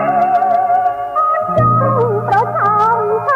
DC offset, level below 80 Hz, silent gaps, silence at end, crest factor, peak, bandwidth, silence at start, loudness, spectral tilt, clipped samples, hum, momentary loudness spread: under 0.1%; -46 dBFS; none; 0 s; 12 dB; -2 dBFS; 7.4 kHz; 0 s; -13 LUFS; -8.5 dB/octave; under 0.1%; none; 3 LU